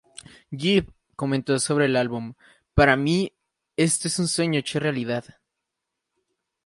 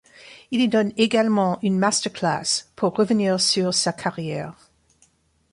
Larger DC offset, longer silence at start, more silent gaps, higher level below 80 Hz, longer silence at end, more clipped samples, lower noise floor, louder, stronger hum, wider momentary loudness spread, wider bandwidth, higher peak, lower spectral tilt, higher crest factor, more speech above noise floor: neither; first, 0.5 s vs 0.25 s; neither; first, -44 dBFS vs -64 dBFS; first, 1.45 s vs 1 s; neither; first, -83 dBFS vs -61 dBFS; about the same, -23 LUFS vs -21 LUFS; neither; first, 13 LU vs 9 LU; about the same, 11.5 kHz vs 11.5 kHz; about the same, -4 dBFS vs -4 dBFS; about the same, -4.5 dB/octave vs -4 dB/octave; about the same, 22 dB vs 18 dB; first, 60 dB vs 40 dB